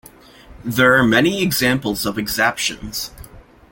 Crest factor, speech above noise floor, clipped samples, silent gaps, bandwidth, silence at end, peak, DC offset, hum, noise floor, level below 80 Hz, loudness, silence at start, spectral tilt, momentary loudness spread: 18 dB; 26 dB; under 0.1%; none; 17 kHz; 0.3 s; -2 dBFS; under 0.1%; none; -43 dBFS; -44 dBFS; -17 LUFS; 0.5 s; -4 dB/octave; 13 LU